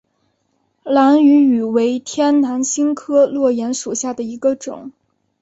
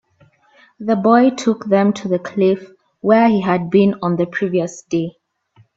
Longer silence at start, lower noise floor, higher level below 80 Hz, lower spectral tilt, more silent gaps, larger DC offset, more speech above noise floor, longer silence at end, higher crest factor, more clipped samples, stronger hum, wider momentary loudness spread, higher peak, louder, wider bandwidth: about the same, 0.85 s vs 0.8 s; first, -66 dBFS vs -54 dBFS; about the same, -62 dBFS vs -60 dBFS; second, -4 dB/octave vs -7 dB/octave; neither; neither; first, 51 dB vs 39 dB; second, 0.5 s vs 0.65 s; about the same, 14 dB vs 16 dB; neither; neither; first, 12 LU vs 9 LU; about the same, -2 dBFS vs 0 dBFS; about the same, -16 LUFS vs -16 LUFS; about the same, 8.2 kHz vs 8 kHz